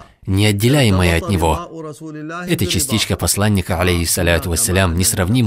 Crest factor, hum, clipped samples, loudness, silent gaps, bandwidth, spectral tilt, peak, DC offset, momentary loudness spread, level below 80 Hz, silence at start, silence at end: 16 dB; none; under 0.1%; -16 LUFS; none; 16.5 kHz; -4.5 dB/octave; 0 dBFS; under 0.1%; 13 LU; -32 dBFS; 0 s; 0 s